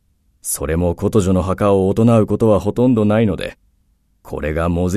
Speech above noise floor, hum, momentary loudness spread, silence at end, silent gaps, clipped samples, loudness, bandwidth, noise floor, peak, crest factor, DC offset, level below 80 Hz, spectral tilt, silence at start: 44 dB; none; 12 LU; 0 s; none; under 0.1%; -16 LUFS; 14 kHz; -60 dBFS; -2 dBFS; 14 dB; under 0.1%; -36 dBFS; -7 dB/octave; 0.45 s